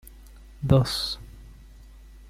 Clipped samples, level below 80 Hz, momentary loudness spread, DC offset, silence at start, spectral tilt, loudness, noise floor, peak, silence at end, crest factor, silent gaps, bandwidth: under 0.1%; -42 dBFS; 17 LU; under 0.1%; 0.2 s; -6 dB/octave; -25 LUFS; -47 dBFS; -4 dBFS; 0.15 s; 24 dB; none; 15.5 kHz